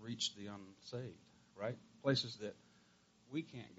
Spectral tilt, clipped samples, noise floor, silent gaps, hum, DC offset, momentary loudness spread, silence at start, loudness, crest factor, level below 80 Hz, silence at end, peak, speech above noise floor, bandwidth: -4 dB/octave; under 0.1%; -71 dBFS; none; none; under 0.1%; 17 LU; 0 s; -43 LUFS; 22 dB; -82 dBFS; 0 s; -22 dBFS; 27 dB; 7.6 kHz